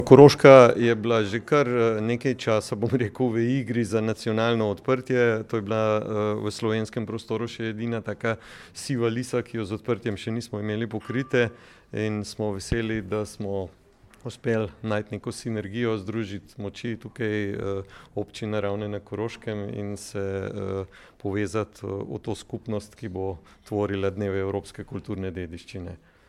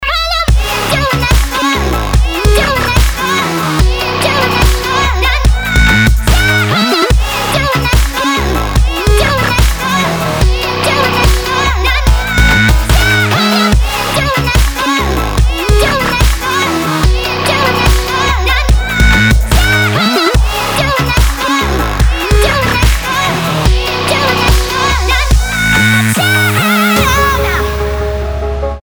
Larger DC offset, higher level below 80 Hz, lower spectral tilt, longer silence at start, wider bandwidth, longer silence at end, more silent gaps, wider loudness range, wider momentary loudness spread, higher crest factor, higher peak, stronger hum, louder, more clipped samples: neither; second, -52 dBFS vs -14 dBFS; first, -6.5 dB/octave vs -4 dB/octave; about the same, 0 s vs 0 s; second, 13 kHz vs over 20 kHz; first, 0.35 s vs 0.05 s; neither; first, 7 LU vs 2 LU; first, 12 LU vs 4 LU; first, 24 dB vs 10 dB; about the same, 0 dBFS vs 0 dBFS; neither; second, -25 LUFS vs -11 LUFS; neither